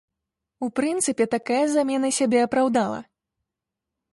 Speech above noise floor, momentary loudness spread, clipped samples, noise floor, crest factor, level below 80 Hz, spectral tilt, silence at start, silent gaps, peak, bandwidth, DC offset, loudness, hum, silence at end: 64 dB; 8 LU; under 0.1%; -86 dBFS; 16 dB; -66 dBFS; -3.5 dB/octave; 0.6 s; none; -8 dBFS; 12 kHz; under 0.1%; -23 LUFS; none; 1.1 s